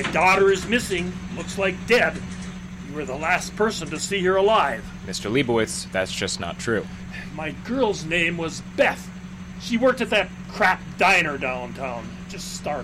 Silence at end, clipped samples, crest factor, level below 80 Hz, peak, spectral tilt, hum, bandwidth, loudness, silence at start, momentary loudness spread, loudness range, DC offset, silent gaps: 0 s; under 0.1%; 16 dB; -44 dBFS; -8 dBFS; -4 dB/octave; none; 16 kHz; -22 LUFS; 0 s; 16 LU; 3 LU; under 0.1%; none